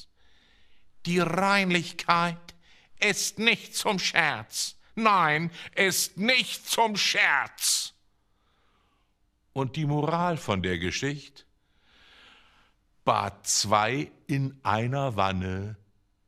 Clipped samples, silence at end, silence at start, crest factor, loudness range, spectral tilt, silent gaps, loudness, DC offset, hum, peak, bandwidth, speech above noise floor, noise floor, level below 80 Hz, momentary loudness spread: under 0.1%; 0.55 s; 0 s; 24 dB; 7 LU; -3 dB/octave; none; -26 LUFS; under 0.1%; none; -4 dBFS; 15.5 kHz; 43 dB; -69 dBFS; -64 dBFS; 10 LU